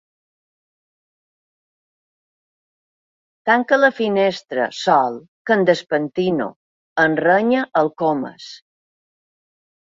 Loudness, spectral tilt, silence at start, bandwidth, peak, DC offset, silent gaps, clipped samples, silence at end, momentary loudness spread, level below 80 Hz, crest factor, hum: -18 LUFS; -5.5 dB/octave; 3.45 s; 7.8 kHz; -2 dBFS; under 0.1%; 5.28-5.45 s, 6.56-6.96 s; under 0.1%; 1.4 s; 12 LU; -66 dBFS; 20 dB; none